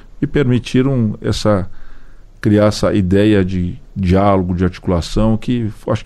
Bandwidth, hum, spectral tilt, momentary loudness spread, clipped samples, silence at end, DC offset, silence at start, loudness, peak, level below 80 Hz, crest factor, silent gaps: 12.5 kHz; none; -7 dB/octave; 7 LU; under 0.1%; 0 s; under 0.1%; 0.15 s; -16 LUFS; -2 dBFS; -30 dBFS; 12 dB; none